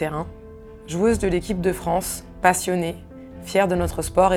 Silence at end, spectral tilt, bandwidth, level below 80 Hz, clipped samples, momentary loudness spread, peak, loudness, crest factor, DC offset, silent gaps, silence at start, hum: 0 s; -5 dB/octave; 19.5 kHz; -40 dBFS; under 0.1%; 19 LU; -2 dBFS; -22 LUFS; 20 dB; under 0.1%; none; 0 s; none